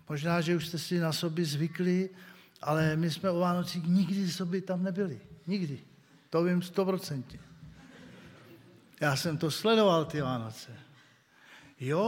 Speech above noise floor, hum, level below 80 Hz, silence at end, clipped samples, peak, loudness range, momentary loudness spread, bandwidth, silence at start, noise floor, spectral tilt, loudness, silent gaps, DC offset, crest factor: 31 dB; none; -68 dBFS; 0 s; under 0.1%; -14 dBFS; 4 LU; 17 LU; 16.5 kHz; 0.1 s; -61 dBFS; -6 dB/octave; -31 LUFS; none; under 0.1%; 18 dB